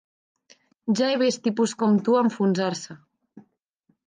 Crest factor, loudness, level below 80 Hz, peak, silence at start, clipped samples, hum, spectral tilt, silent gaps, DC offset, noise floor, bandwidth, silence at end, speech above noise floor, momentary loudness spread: 16 dB; -23 LUFS; -76 dBFS; -10 dBFS; 0.85 s; under 0.1%; none; -5.5 dB/octave; none; under 0.1%; -70 dBFS; 9.8 kHz; 0.65 s; 48 dB; 13 LU